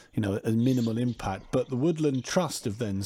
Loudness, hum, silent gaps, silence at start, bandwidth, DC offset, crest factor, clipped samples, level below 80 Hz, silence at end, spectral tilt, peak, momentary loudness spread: -28 LUFS; none; none; 0.15 s; 16 kHz; under 0.1%; 14 dB; under 0.1%; -54 dBFS; 0 s; -6 dB/octave; -12 dBFS; 6 LU